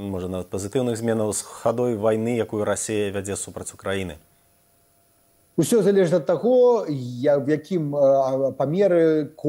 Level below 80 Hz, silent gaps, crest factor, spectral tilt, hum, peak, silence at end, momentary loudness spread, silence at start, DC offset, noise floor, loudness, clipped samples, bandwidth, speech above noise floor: -60 dBFS; none; 14 dB; -6 dB/octave; none; -8 dBFS; 0 s; 11 LU; 0 s; under 0.1%; -61 dBFS; -22 LUFS; under 0.1%; 16 kHz; 39 dB